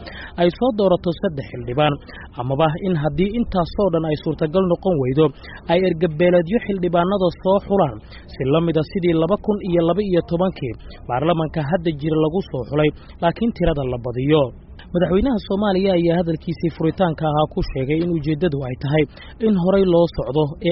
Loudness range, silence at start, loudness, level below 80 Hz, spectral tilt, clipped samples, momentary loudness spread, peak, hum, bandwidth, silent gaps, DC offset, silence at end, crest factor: 2 LU; 0 s; -20 LUFS; -38 dBFS; -6.5 dB/octave; under 0.1%; 7 LU; -4 dBFS; none; 5.8 kHz; none; under 0.1%; 0 s; 16 dB